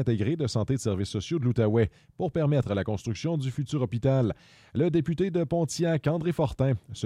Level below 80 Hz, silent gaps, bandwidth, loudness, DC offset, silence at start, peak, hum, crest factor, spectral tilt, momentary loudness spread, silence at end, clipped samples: -52 dBFS; none; 13 kHz; -28 LUFS; under 0.1%; 0 s; -12 dBFS; none; 14 dB; -7 dB/octave; 6 LU; 0 s; under 0.1%